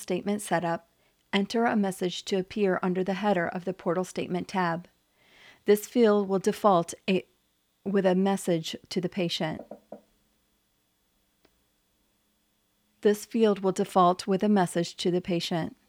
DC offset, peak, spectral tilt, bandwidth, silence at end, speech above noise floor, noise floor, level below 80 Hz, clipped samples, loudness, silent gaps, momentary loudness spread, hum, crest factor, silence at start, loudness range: under 0.1%; -8 dBFS; -5.5 dB/octave; 16 kHz; 0.2 s; 46 dB; -72 dBFS; -68 dBFS; under 0.1%; -27 LUFS; none; 9 LU; none; 20 dB; 0 s; 9 LU